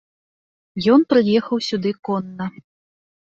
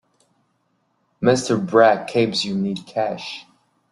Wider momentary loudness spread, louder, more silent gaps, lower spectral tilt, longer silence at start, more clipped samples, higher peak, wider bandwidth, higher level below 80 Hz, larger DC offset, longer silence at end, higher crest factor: about the same, 16 LU vs 14 LU; about the same, -19 LUFS vs -20 LUFS; first, 1.99-2.03 s vs none; first, -6.5 dB/octave vs -5 dB/octave; second, 0.75 s vs 1.2 s; neither; about the same, -2 dBFS vs -2 dBFS; second, 7.8 kHz vs 12 kHz; about the same, -60 dBFS vs -62 dBFS; neither; first, 0.75 s vs 0.5 s; about the same, 18 dB vs 20 dB